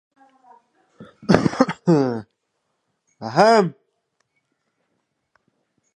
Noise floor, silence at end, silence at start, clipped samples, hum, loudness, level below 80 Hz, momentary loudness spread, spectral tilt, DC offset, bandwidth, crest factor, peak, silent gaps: -74 dBFS; 2.25 s; 1 s; under 0.1%; none; -18 LUFS; -54 dBFS; 17 LU; -6.5 dB/octave; under 0.1%; 10 kHz; 22 dB; 0 dBFS; none